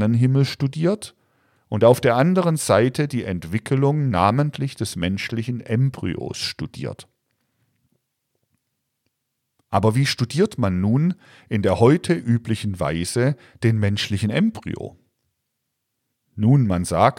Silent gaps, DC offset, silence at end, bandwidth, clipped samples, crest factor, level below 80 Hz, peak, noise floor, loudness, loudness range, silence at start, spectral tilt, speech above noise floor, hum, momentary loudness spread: none; under 0.1%; 0.05 s; 15.5 kHz; under 0.1%; 18 dB; -52 dBFS; -4 dBFS; -77 dBFS; -21 LUFS; 9 LU; 0 s; -6.5 dB/octave; 57 dB; none; 12 LU